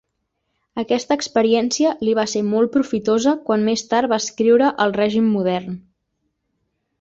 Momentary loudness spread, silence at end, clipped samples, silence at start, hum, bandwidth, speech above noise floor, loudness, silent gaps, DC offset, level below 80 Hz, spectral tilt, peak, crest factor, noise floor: 6 LU; 1.2 s; under 0.1%; 0.75 s; none; 7.8 kHz; 56 dB; -18 LUFS; none; under 0.1%; -60 dBFS; -4.5 dB/octave; -4 dBFS; 16 dB; -74 dBFS